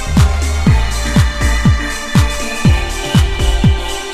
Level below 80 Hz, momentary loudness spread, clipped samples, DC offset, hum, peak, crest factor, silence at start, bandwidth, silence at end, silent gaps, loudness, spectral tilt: -16 dBFS; 3 LU; under 0.1%; under 0.1%; none; 0 dBFS; 12 dB; 0 s; 14 kHz; 0 s; none; -14 LUFS; -5 dB/octave